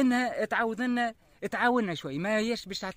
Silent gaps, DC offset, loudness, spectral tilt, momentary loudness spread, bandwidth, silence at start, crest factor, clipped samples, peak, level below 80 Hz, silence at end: none; under 0.1%; -29 LUFS; -5 dB/octave; 7 LU; 16 kHz; 0 s; 16 dB; under 0.1%; -14 dBFS; -64 dBFS; 0.05 s